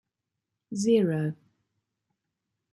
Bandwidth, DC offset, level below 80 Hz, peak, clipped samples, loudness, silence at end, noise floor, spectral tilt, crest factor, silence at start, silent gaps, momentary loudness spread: 12 kHz; under 0.1%; -74 dBFS; -12 dBFS; under 0.1%; -26 LUFS; 1.4 s; -85 dBFS; -6.5 dB/octave; 18 dB; 0.7 s; none; 16 LU